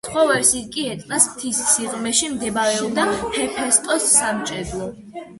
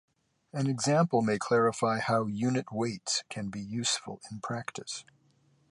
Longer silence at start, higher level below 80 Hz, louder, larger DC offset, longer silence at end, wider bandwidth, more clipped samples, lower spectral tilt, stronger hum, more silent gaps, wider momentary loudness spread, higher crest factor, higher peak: second, 0.05 s vs 0.55 s; first, -50 dBFS vs -68 dBFS; first, -18 LUFS vs -30 LUFS; neither; second, 0 s vs 0.7 s; about the same, 12 kHz vs 11.5 kHz; neither; second, -1.5 dB/octave vs -4.5 dB/octave; neither; neither; about the same, 11 LU vs 13 LU; about the same, 20 dB vs 18 dB; first, 0 dBFS vs -12 dBFS